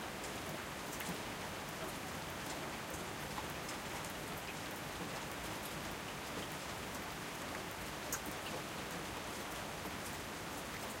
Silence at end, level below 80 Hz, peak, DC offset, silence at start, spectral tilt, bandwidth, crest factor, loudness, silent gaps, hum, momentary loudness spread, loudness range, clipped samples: 0 s; -60 dBFS; -26 dBFS; under 0.1%; 0 s; -3 dB/octave; 17 kHz; 18 dB; -43 LUFS; none; none; 2 LU; 0 LU; under 0.1%